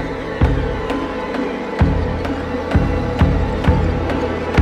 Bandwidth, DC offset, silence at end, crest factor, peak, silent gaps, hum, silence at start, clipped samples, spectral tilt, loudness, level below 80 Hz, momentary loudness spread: 9 kHz; under 0.1%; 0 s; 16 dB; -2 dBFS; none; none; 0 s; under 0.1%; -8 dB/octave; -19 LUFS; -24 dBFS; 5 LU